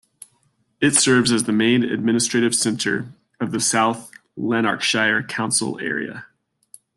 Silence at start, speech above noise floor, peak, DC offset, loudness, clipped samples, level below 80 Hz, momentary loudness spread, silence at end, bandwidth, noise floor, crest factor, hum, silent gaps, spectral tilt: 0.8 s; 45 dB; -2 dBFS; under 0.1%; -19 LUFS; under 0.1%; -62 dBFS; 13 LU; 0.7 s; 12.5 kHz; -65 dBFS; 20 dB; none; none; -3 dB/octave